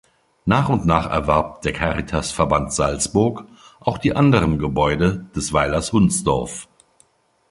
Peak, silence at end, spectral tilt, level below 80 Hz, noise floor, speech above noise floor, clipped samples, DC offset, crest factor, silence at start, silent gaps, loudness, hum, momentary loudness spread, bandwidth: 0 dBFS; 0.9 s; -5.5 dB/octave; -36 dBFS; -59 dBFS; 40 dB; under 0.1%; under 0.1%; 20 dB; 0.45 s; none; -19 LUFS; none; 8 LU; 11.5 kHz